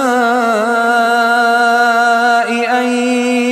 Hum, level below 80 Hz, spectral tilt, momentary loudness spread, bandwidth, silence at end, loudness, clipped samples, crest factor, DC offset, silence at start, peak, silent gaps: none; -72 dBFS; -3 dB/octave; 3 LU; 14.5 kHz; 0 s; -12 LUFS; under 0.1%; 12 dB; under 0.1%; 0 s; 0 dBFS; none